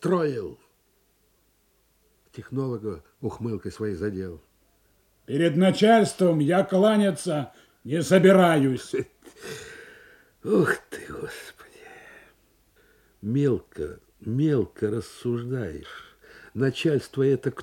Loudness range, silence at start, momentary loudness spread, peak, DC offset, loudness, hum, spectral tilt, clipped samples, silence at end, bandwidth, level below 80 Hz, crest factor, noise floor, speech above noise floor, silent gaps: 12 LU; 0 s; 21 LU; -6 dBFS; under 0.1%; -24 LUFS; none; -6.5 dB/octave; under 0.1%; 0 s; 15.5 kHz; -60 dBFS; 20 dB; -66 dBFS; 43 dB; none